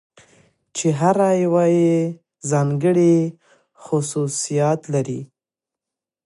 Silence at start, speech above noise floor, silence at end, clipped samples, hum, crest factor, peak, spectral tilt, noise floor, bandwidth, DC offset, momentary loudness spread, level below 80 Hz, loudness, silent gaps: 0.75 s; 70 dB; 1.05 s; under 0.1%; none; 18 dB; -2 dBFS; -6.5 dB/octave; -88 dBFS; 11.5 kHz; under 0.1%; 12 LU; -68 dBFS; -19 LUFS; none